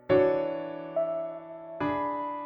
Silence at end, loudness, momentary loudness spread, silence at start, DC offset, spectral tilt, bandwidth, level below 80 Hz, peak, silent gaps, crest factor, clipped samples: 0 s; -30 LUFS; 14 LU; 0.1 s; under 0.1%; -9 dB/octave; 5.6 kHz; -62 dBFS; -12 dBFS; none; 18 dB; under 0.1%